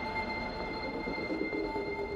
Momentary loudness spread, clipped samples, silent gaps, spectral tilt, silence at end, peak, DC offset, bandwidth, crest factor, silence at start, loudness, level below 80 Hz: 2 LU; under 0.1%; none; -6 dB/octave; 0 s; -20 dBFS; under 0.1%; 16 kHz; 14 dB; 0 s; -35 LUFS; -50 dBFS